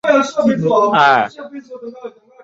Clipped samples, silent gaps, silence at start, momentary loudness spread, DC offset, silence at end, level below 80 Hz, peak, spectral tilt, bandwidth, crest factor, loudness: under 0.1%; none; 0.05 s; 21 LU; under 0.1%; 0.35 s; -60 dBFS; 0 dBFS; -5.5 dB/octave; 7.8 kHz; 14 dB; -13 LUFS